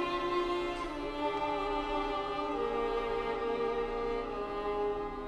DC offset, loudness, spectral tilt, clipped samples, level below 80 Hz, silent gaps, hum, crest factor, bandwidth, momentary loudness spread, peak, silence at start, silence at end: under 0.1%; -34 LUFS; -5.5 dB/octave; under 0.1%; -50 dBFS; none; none; 14 dB; 11.5 kHz; 4 LU; -20 dBFS; 0 s; 0 s